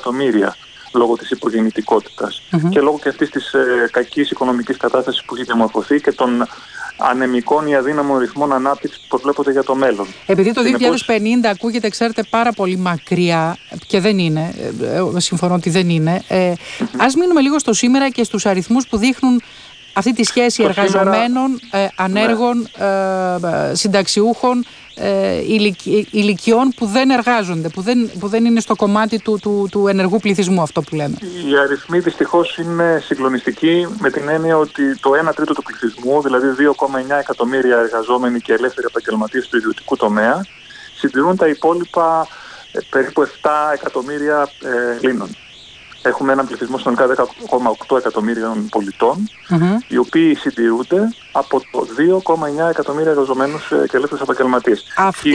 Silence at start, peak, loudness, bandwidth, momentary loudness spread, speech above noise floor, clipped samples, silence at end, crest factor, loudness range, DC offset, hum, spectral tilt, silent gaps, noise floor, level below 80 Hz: 0 s; -2 dBFS; -16 LUFS; 10.5 kHz; 7 LU; 24 dB; under 0.1%; 0 s; 14 dB; 2 LU; under 0.1%; none; -5 dB/octave; none; -39 dBFS; -54 dBFS